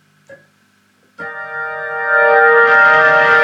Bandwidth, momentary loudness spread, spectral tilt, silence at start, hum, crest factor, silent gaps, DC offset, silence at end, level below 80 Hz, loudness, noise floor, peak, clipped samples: 7.6 kHz; 19 LU; -4 dB/octave; 0.3 s; none; 14 dB; none; under 0.1%; 0 s; -66 dBFS; -10 LUFS; -55 dBFS; 0 dBFS; under 0.1%